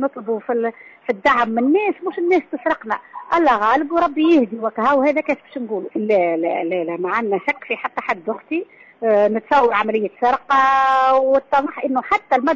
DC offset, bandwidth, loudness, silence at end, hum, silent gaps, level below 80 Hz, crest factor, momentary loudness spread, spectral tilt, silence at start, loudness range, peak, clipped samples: under 0.1%; 7.6 kHz; -18 LUFS; 0 s; none; none; -58 dBFS; 12 dB; 10 LU; -6 dB/octave; 0 s; 5 LU; -6 dBFS; under 0.1%